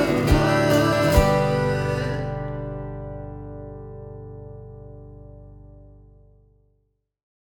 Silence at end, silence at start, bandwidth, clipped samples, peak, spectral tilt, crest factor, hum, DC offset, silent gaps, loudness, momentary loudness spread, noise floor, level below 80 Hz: 1.7 s; 0 s; 19 kHz; under 0.1%; -2 dBFS; -6 dB/octave; 22 dB; 50 Hz at -65 dBFS; under 0.1%; none; -21 LUFS; 23 LU; -70 dBFS; -34 dBFS